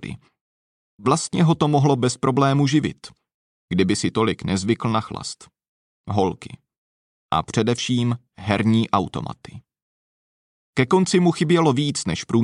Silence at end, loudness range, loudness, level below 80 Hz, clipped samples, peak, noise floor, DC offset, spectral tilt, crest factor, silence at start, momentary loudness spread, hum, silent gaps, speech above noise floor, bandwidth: 0 s; 5 LU; -21 LUFS; -54 dBFS; under 0.1%; -4 dBFS; under -90 dBFS; under 0.1%; -5.5 dB/octave; 18 dB; 0 s; 14 LU; none; 0.41-0.98 s, 3.34-3.68 s, 5.69-6.04 s, 6.78-7.29 s, 9.82-10.73 s; over 70 dB; 11.5 kHz